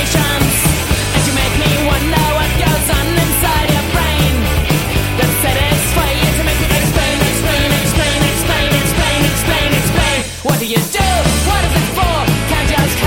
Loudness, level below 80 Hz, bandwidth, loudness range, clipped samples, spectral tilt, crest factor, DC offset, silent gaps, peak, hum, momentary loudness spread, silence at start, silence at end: -13 LUFS; -20 dBFS; 17 kHz; 1 LU; under 0.1%; -4 dB/octave; 14 dB; under 0.1%; none; 0 dBFS; none; 2 LU; 0 s; 0 s